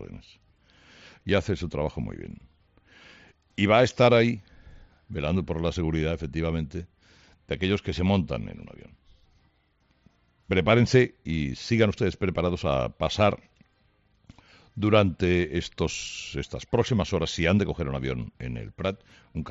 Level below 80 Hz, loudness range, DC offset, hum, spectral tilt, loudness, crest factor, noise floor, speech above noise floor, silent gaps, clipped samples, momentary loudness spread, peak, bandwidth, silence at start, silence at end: -46 dBFS; 6 LU; under 0.1%; none; -5.5 dB/octave; -26 LUFS; 20 dB; -67 dBFS; 42 dB; none; under 0.1%; 17 LU; -6 dBFS; 8 kHz; 0 s; 0 s